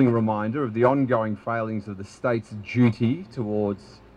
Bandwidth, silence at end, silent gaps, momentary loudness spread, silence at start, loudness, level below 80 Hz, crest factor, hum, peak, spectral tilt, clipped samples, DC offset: 9.2 kHz; 0.2 s; none; 9 LU; 0 s; -25 LUFS; -60 dBFS; 18 dB; none; -6 dBFS; -8.5 dB/octave; under 0.1%; under 0.1%